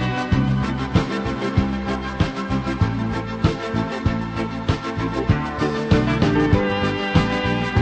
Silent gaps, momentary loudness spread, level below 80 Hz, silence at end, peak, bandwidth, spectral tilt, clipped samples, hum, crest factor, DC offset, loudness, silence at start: none; 6 LU; -32 dBFS; 0 s; -2 dBFS; 8.8 kHz; -7 dB/octave; under 0.1%; none; 18 dB; under 0.1%; -21 LUFS; 0 s